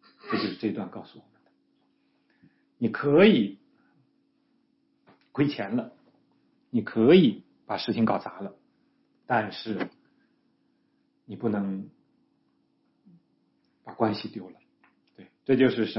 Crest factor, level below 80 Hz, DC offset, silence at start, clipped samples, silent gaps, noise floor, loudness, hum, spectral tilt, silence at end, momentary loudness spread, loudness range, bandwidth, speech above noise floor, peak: 22 dB; -70 dBFS; under 0.1%; 0.25 s; under 0.1%; none; -70 dBFS; -26 LUFS; none; -10 dB/octave; 0 s; 23 LU; 11 LU; 5.8 kHz; 46 dB; -6 dBFS